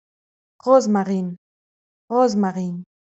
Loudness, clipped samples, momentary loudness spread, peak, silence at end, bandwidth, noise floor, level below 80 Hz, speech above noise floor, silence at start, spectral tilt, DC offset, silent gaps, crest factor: -20 LUFS; under 0.1%; 14 LU; -2 dBFS; 0.25 s; 8 kHz; under -90 dBFS; -70 dBFS; over 71 dB; 0.65 s; -7 dB/octave; under 0.1%; 1.38-2.08 s; 20 dB